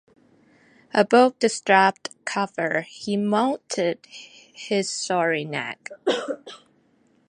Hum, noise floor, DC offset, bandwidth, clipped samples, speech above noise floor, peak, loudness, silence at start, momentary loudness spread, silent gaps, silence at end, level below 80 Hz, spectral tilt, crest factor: none; -62 dBFS; under 0.1%; 11 kHz; under 0.1%; 39 dB; -2 dBFS; -23 LUFS; 0.95 s; 18 LU; none; 0.7 s; -74 dBFS; -4 dB/octave; 22 dB